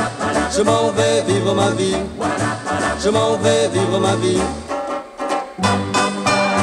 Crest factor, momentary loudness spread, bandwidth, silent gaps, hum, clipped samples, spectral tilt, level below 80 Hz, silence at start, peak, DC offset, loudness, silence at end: 16 dB; 7 LU; 12.5 kHz; none; none; under 0.1%; -4.5 dB/octave; -42 dBFS; 0 s; 0 dBFS; under 0.1%; -18 LUFS; 0 s